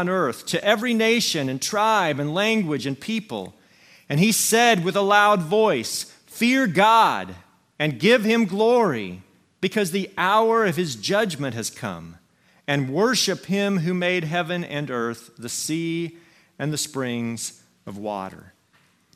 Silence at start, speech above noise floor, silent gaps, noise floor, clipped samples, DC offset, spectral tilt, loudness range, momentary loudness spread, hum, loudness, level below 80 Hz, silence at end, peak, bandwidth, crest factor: 0 s; 40 dB; none; -61 dBFS; under 0.1%; under 0.1%; -4 dB/octave; 8 LU; 14 LU; none; -21 LUFS; -68 dBFS; 0.8 s; -4 dBFS; 16 kHz; 20 dB